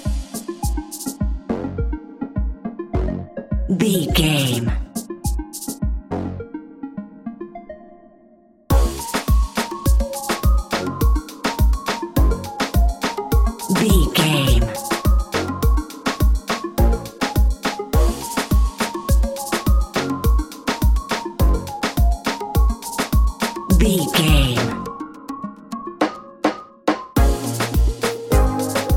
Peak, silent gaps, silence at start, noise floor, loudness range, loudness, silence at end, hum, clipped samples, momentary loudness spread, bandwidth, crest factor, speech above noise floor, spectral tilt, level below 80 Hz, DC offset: -2 dBFS; none; 0 s; -51 dBFS; 7 LU; -21 LUFS; 0 s; none; under 0.1%; 13 LU; 17 kHz; 18 dB; 34 dB; -5 dB/octave; -22 dBFS; under 0.1%